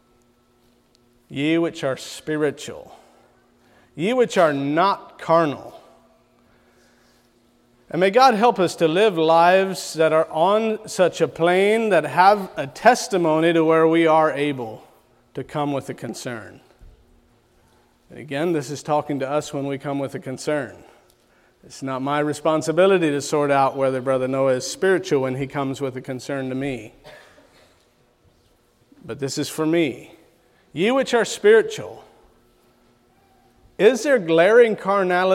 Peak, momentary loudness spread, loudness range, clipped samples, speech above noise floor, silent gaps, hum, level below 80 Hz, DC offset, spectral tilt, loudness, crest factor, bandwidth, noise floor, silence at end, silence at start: -2 dBFS; 15 LU; 11 LU; under 0.1%; 40 dB; none; none; -62 dBFS; under 0.1%; -5 dB/octave; -20 LUFS; 20 dB; 16 kHz; -60 dBFS; 0 s; 1.3 s